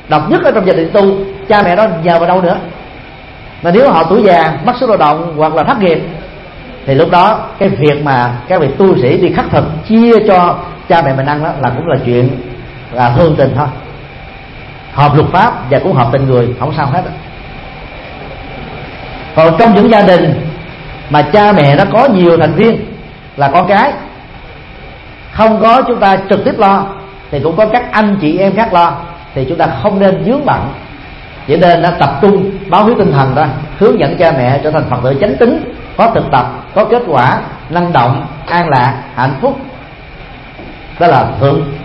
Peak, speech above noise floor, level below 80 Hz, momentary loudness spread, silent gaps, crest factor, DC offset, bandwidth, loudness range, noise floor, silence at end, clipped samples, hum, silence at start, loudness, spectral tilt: 0 dBFS; 21 dB; -34 dBFS; 21 LU; none; 10 dB; under 0.1%; 6.2 kHz; 4 LU; -30 dBFS; 0 s; 0.3%; none; 0.05 s; -9 LUFS; -9 dB/octave